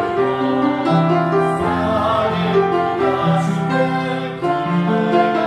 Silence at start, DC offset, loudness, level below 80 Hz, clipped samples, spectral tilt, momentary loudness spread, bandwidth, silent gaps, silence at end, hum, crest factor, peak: 0 s; under 0.1%; -17 LUFS; -48 dBFS; under 0.1%; -7.5 dB/octave; 3 LU; 10.5 kHz; none; 0 s; none; 14 dB; -2 dBFS